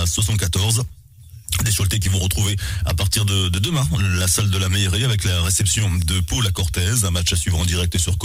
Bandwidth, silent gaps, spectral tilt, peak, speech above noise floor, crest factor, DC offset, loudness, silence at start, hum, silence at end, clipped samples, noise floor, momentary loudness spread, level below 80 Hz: 16 kHz; none; -3.5 dB/octave; -6 dBFS; 23 dB; 14 dB; under 0.1%; -19 LUFS; 0 s; none; 0 s; under 0.1%; -42 dBFS; 4 LU; -30 dBFS